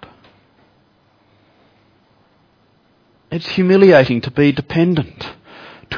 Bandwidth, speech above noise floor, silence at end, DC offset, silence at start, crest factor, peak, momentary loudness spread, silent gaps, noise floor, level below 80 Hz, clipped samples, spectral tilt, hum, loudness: 5.4 kHz; 43 dB; 0 s; under 0.1%; 3.3 s; 18 dB; 0 dBFS; 22 LU; none; -56 dBFS; -50 dBFS; under 0.1%; -8 dB/octave; none; -14 LUFS